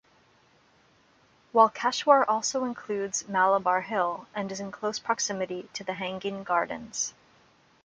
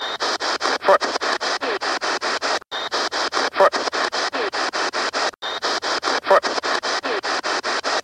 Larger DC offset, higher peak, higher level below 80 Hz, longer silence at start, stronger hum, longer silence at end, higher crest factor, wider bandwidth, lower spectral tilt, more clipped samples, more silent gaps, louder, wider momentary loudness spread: neither; about the same, -6 dBFS vs -4 dBFS; second, -72 dBFS vs -64 dBFS; first, 1.55 s vs 0 s; neither; first, 0.75 s vs 0 s; about the same, 22 dB vs 18 dB; second, 9.6 kHz vs 13 kHz; first, -2.5 dB/octave vs -0.5 dB/octave; neither; neither; second, -27 LUFS vs -21 LUFS; first, 12 LU vs 5 LU